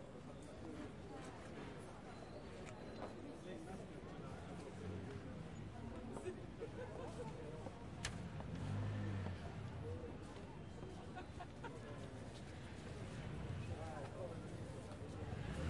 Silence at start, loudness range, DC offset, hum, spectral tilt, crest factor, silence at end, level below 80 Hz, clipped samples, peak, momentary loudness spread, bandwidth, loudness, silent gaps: 0 s; 5 LU; under 0.1%; none; -6.5 dB/octave; 20 dB; 0 s; -62 dBFS; under 0.1%; -28 dBFS; 6 LU; 11.5 kHz; -51 LUFS; none